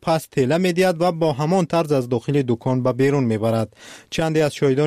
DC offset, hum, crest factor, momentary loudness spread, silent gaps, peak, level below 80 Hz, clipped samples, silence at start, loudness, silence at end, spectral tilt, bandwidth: under 0.1%; none; 12 dB; 3 LU; none; -8 dBFS; -54 dBFS; under 0.1%; 0.05 s; -20 LUFS; 0 s; -6.5 dB/octave; 15 kHz